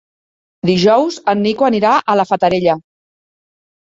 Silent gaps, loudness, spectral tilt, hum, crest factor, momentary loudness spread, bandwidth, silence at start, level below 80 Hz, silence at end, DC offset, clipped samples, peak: none; -14 LUFS; -6 dB/octave; none; 14 dB; 5 LU; 7.8 kHz; 0.65 s; -54 dBFS; 1.1 s; under 0.1%; under 0.1%; -2 dBFS